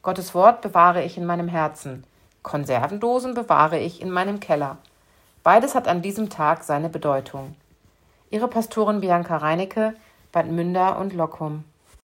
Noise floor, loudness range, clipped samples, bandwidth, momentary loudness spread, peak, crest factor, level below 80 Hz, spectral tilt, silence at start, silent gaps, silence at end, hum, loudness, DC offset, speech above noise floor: -59 dBFS; 3 LU; under 0.1%; 16.5 kHz; 14 LU; 0 dBFS; 22 dB; -62 dBFS; -6 dB/octave; 0.05 s; none; 0.55 s; none; -22 LUFS; under 0.1%; 37 dB